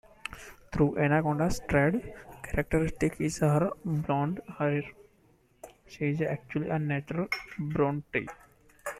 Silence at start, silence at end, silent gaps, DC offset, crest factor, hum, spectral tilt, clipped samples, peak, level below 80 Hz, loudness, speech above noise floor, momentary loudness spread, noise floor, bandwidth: 0.3 s; 0 s; none; under 0.1%; 18 dB; none; -7 dB/octave; under 0.1%; -12 dBFS; -48 dBFS; -30 LUFS; 36 dB; 16 LU; -64 dBFS; 14.5 kHz